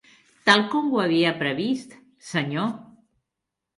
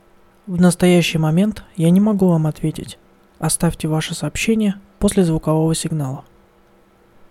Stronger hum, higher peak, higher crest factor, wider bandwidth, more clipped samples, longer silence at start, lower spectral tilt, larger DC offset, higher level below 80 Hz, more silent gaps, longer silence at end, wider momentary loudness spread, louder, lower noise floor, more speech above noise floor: neither; about the same, -2 dBFS vs 0 dBFS; about the same, 22 dB vs 18 dB; second, 11.5 kHz vs 15 kHz; neither; about the same, 0.45 s vs 0.45 s; about the same, -5 dB/octave vs -6 dB/octave; neither; second, -70 dBFS vs -40 dBFS; neither; second, 0.95 s vs 1.1 s; about the same, 11 LU vs 11 LU; second, -23 LUFS vs -18 LUFS; first, -84 dBFS vs -52 dBFS; first, 62 dB vs 36 dB